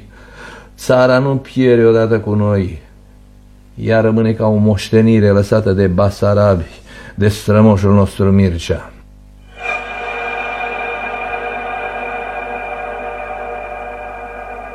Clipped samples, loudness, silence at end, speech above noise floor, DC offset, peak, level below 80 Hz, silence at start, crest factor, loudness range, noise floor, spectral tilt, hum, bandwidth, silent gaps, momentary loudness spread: under 0.1%; -15 LUFS; 0 s; 30 dB; under 0.1%; 0 dBFS; -38 dBFS; 0 s; 14 dB; 9 LU; -41 dBFS; -7.5 dB/octave; 50 Hz at -30 dBFS; 13.5 kHz; none; 16 LU